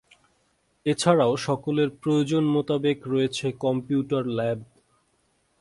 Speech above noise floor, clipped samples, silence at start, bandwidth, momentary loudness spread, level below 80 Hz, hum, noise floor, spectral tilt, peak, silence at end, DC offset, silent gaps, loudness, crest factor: 45 dB; under 0.1%; 0.85 s; 11.5 kHz; 7 LU; -64 dBFS; none; -68 dBFS; -6 dB/octave; -6 dBFS; 0.95 s; under 0.1%; none; -25 LUFS; 20 dB